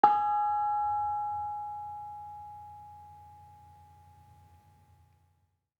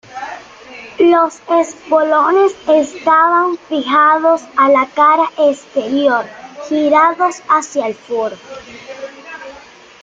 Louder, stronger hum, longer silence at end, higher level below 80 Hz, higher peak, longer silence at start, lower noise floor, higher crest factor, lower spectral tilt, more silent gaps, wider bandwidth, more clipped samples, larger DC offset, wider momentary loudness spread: second, -32 LUFS vs -13 LUFS; neither; first, 2.25 s vs 0.5 s; second, -72 dBFS vs -60 dBFS; second, -8 dBFS vs -2 dBFS; about the same, 0.05 s vs 0.1 s; first, -74 dBFS vs -39 dBFS; first, 26 dB vs 12 dB; first, -6 dB/octave vs -3.5 dB/octave; neither; second, 5 kHz vs 9.2 kHz; neither; neither; first, 24 LU vs 20 LU